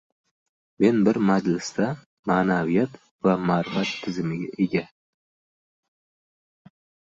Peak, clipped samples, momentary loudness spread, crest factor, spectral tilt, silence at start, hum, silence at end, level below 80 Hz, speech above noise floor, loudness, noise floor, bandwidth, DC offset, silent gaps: -6 dBFS; under 0.1%; 9 LU; 20 dB; -6.5 dB/octave; 0.8 s; none; 2.25 s; -62 dBFS; over 67 dB; -24 LUFS; under -90 dBFS; 7.8 kHz; under 0.1%; 2.06-2.23 s, 3.11-3.19 s